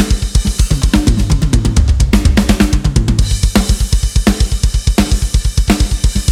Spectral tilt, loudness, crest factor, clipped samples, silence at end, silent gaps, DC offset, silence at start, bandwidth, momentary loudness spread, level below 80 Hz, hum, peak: -5 dB/octave; -13 LUFS; 10 dB; under 0.1%; 0 s; none; under 0.1%; 0 s; 15 kHz; 3 LU; -14 dBFS; none; 0 dBFS